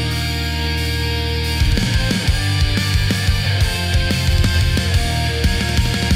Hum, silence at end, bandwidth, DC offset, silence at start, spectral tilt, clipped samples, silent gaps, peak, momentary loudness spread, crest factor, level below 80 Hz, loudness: none; 0 s; 16 kHz; under 0.1%; 0 s; -4.5 dB/octave; under 0.1%; none; -4 dBFS; 3 LU; 14 dB; -22 dBFS; -18 LUFS